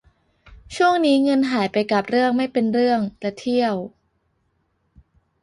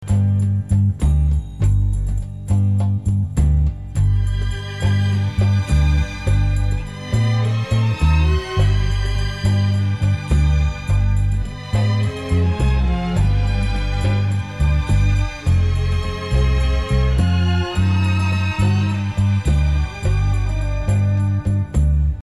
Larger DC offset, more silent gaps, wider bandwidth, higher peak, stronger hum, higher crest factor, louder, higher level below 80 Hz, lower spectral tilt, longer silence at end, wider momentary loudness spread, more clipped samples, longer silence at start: second, under 0.1% vs 0.4%; neither; about the same, 11 kHz vs 11 kHz; about the same, -6 dBFS vs -6 dBFS; neither; first, 16 dB vs 10 dB; about the same, -20 LUFS vs -19 LUFS; second, -56 dBFS vs -22 dBFS; second, -5.5 dB/octave vs -7 dB/octave; first, 1.55 s vs 0 s; first, 10 LU vs 4 LU; neither; first, 0.5 s vs 0 s